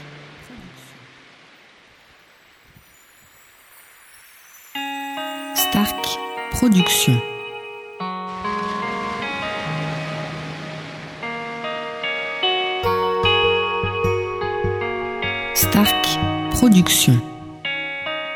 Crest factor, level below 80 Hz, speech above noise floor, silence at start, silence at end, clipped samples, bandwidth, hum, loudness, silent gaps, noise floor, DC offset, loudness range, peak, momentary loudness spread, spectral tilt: 20 dB; -44 dBFS; 35 dB; 0 s; 0 s; under 0.1%; over 20 kHz; none; -20 LUFS; none; -51 dBFS; under 0.1%; 9 LU; -2 dBFS; 16 LU; -4 dB/octave